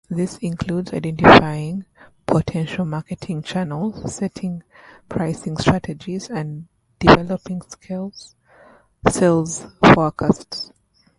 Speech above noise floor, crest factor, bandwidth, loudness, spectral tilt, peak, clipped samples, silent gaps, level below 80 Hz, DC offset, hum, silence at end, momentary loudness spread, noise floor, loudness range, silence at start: 32 dB; 20 dB; 11.5 kHz; -19 LUFS; -5.5 dB/octave; 0 dBFS; under 0.1%; none; -42 dBFS; under 0.1%; none; 0.55 s; 18 LU; -50 dBFS; 7 LU; 0.1 s